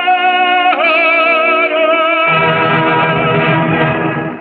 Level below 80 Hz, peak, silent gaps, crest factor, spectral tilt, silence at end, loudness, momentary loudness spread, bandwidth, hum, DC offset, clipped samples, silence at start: -48 dBFS; -2 dBFS; none; 10 dB; -8.5 dB/octave; 0 s; -11 LUFS; 4 LU; 5 kHz; none; under 0.1%; under 0.1%; 0 s